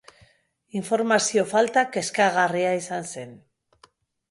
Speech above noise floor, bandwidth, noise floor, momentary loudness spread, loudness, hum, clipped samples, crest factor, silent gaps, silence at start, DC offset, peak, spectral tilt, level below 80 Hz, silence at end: 39 dB; 11.5 kHz; -62 dBFS; 14 LU; -23 LUFS; none; under 0.1%; 18 dB; none; 0.75 s; under 0.1%; -6 dBFS; -3.5 dB/octave; -70 dBFS; 0.95 s